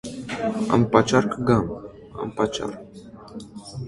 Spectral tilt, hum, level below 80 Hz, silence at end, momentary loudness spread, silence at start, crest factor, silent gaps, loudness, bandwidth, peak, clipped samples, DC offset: -6 dB/octave; none; -48 dBFS; 0 s; 22 LU; 0.05 s; 22 dB; none; -23 LUFS; 11.5 kHz; -2 dBFS; under 0.1%; under 0.1%